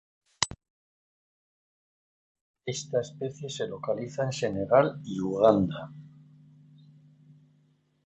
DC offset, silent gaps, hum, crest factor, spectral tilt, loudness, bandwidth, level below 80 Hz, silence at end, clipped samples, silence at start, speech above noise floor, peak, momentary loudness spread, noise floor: under 0.1%; 0.70-2.35 s, 2.41-2.54 s; 50 Hz at -50 dBFS; 26 dB; -5 dB/octave; -28 LUFS; 8.4 kHz; -60 dBFS; 1.95 s; under 0.1%; 0.4 s; 39 dB; -6 dBFS; 14 LU; -67 dBFS